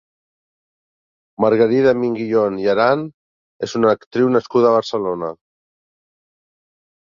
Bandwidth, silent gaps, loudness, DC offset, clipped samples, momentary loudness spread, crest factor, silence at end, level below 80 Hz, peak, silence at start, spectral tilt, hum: 7.4 kHz; 3.14-3.59 s, 4.07-4.11 s; -17 LUFS; under 0.1%; under 0.1%; 11 LU; 16 dB; 1.65 s; -60 dBFS; -2 dBFS; 1.4 s; -6.5 dB/octave; none